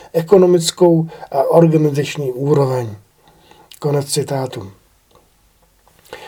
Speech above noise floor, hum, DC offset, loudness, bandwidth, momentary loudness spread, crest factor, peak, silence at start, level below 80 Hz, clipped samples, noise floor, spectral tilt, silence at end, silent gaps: 40 dB; none; under 0.1%; -15 LUFS; 19 kHz; 12 LU; 16 dB; 0 dBFS; 0.15 s; -58 dBFS; under 0.1%; -55 dBFS; -6 dB/octave; 0 s; none